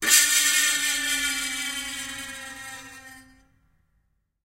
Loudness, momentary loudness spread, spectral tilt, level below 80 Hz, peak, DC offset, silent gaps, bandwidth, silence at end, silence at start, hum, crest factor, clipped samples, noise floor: -21 LUFS; 21 LU; 2 dB/octave; -58 dBFS; -4 dBFS; under 0.1%; none; 16 kHz; 1.3 s; 0 s; none; 24 dB; under 0.1%; -70 dBFS